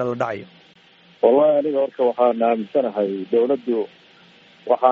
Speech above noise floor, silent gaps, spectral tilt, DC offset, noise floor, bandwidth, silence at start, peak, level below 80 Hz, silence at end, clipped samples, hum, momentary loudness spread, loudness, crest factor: 33 dB; none; -5 dB/octave; under 0.1%; -52 dBFS; 6.8 kHz; 0 s; -2 dBFS; -74 dBFS; 0 s; under 0.1%; none; 10 LU; -20 LUFS; 18 dB